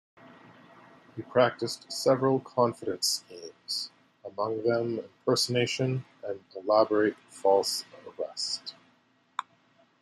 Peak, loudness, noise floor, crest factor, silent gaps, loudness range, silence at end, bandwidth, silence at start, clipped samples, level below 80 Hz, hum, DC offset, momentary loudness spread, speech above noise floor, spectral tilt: -10 dBFS; -28 LUFS; -66 dBFS; 20 dB; none; 3 LU; 0.6 s; 15 kHz; 1.15 s; under 0.1%; -76 dBFS; none; under 0.1%; 15 LU; 38 dB; -4 dB/octave